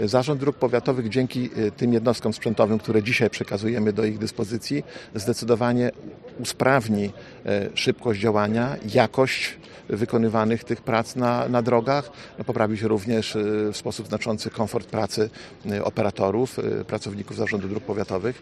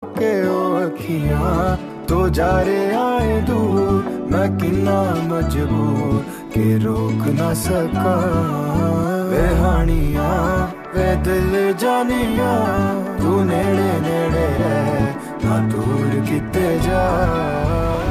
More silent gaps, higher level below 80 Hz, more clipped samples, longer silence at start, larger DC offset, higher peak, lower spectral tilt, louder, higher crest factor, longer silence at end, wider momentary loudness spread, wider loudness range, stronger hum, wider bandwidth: neither; second, -58 dBFS vs -28 dBFS; neither; about the same, 0 s vs 0 s; neither; first, 0 dBFS vs -6 dBFS; about the same, -6 dB/octave vs -7 dB/octave; second, -24 LUFS vs -18 LUFS; first, 22 dB vs 12 dB; about the same, 0 s vs 0 s; first, 9 LU vs 3 LU; about the same, 3 LU vs 1 LU; neither; second, 13 kHz vs 15.5 kHz